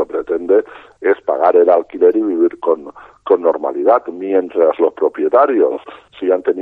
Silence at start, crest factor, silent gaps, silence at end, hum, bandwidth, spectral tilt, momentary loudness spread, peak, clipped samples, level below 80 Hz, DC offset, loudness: 0 s; 14 dB; none; 0 s; none; 4 kHz; -7.5 dB/octave; 8 LU; 0 dBFS; under 0.1%; -60 dBFS; under 0.1%; -15 LUFS